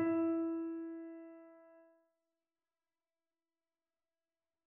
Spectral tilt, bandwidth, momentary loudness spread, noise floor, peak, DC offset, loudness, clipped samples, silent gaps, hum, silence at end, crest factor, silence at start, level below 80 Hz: -8.5 dB/octave; 2.8 kHz; 22 LU; under -90 dBFS; -26 dBFS; under 0.1%; -39 LUFS; under 0.1%; none; none; 2.85 s; 18 dB; 0 s; -90 dBFS